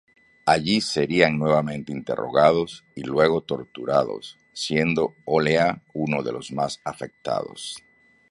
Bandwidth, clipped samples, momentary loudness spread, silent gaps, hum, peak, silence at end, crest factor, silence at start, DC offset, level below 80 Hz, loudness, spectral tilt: 11.5 kHz; under 0.1%; 14 LU; none; none; 0 dBFS; 0.55 s; 24 dB; 0.45 s; under 0.1%; -56 dBFS; -23 LUFS; -5 dB/octave